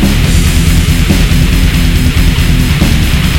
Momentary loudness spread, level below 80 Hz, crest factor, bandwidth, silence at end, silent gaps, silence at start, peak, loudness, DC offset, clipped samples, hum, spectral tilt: 1 LU; -10 dBFS; 8 dB; 17 kHz; 0 s; none; 0 s; 0 dBFS; -9 LUFS; 2%; 1%; none; -5 dB/octave